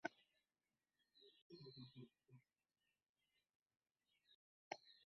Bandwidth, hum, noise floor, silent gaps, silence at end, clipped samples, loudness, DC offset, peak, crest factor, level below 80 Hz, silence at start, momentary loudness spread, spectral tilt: 5.8 kHz; none; under -90 dBFS; 1.42-1.50 s, 3.09-3.15 s, 3.55-3.66 s, 4.35-4.71 s; 0.1 s; under 0.1%; -60 LUFS; under 0.1%; -28 dBFS; 36 dB; under -90 dBFS; 0.05 s; 9 LU; -3 dB/octave